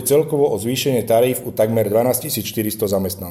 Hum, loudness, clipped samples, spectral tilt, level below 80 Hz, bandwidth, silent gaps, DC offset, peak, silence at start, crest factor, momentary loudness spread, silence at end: none; -18 LUFS; under 0.1%; -5 dB/octave; -54 dBFS; 17 kHz; none; under 0.1%; -4 dBFS; 0 s; 14 dB; 5 LU; 0 s